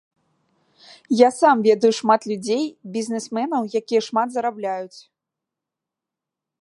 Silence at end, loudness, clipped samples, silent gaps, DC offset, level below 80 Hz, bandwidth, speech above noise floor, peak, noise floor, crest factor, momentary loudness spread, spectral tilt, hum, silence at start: 1.75 s; -20 LUFS; under 0.1%; none; under 0.1%; -76 dBFS; 11.5 kHz; 66 dB; -2 dBFS; -86 dBFS; 20 dB; 12 LU; -4.5 dB/octave; none; 1.1 s